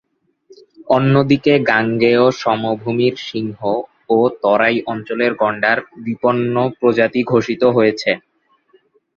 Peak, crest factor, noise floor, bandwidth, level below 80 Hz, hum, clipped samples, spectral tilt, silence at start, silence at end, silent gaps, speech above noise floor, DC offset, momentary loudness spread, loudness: 0 dBFS; 16 dB; -56 dBFS; 7.2 kHz; -56 dBFS; none; under 0.1%; -7 dB/octave; 0.8 s; 1 s; none; 40 dB; under 0.1%; 8 LU; -16 LUFS